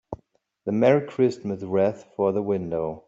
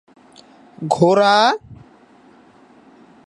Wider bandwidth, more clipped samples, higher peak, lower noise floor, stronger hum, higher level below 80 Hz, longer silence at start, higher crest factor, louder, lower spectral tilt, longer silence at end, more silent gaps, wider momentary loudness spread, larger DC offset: second, 7.8 kHz vs 11 kHz; neither; second, -6 dBFS vs 0 dBFS; first, -64 dBFS vs -49 dBFS; neither; about the same, -60 dBFS vs -60 dBFS; second, 0.1 s vs 0.8 s; about the same, 18 dB vs 20 dB; second, -24 LUFS vs -15 LUFS; first, -8 dB/octave vs -5 dB/octave; second, 0.1 s vs 1.5 s; neither; about the same, 13 LU vs 15 LU; neither